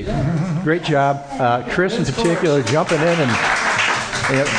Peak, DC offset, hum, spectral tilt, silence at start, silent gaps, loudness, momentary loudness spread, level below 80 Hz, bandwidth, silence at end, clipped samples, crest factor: -4 dBFS; under 0.1%; none; -5 dB/octave; 0 s; none; -18 LUFS; 4 LU; -40 dBFS; 10.5 kHz; 0 s; under 0.1%; 14 dB